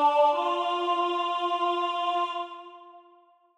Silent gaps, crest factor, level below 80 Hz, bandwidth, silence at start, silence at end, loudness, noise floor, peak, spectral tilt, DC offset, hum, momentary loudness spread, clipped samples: none; 14 dB; -90 dBFS; 10.5 kHz; 0 s; 0.6 s; -27 LUFS; -59 dBFS; -12 dBFS; -1.5 dB/octave; under 0.1%; none; 14 LU; under 0.1%